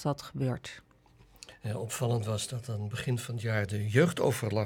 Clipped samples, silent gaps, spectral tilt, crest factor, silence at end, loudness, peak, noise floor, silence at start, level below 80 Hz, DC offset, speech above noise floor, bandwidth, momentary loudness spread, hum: under 0.1%; none; -5.5 dB/octave; 22 dB; 0 s; -32 LUFS; -10 dBFS; -60 dBFS; 0 s; -62 dBFS; under 0.1%; 29 dB; 17.5 kHz; 16 LU; none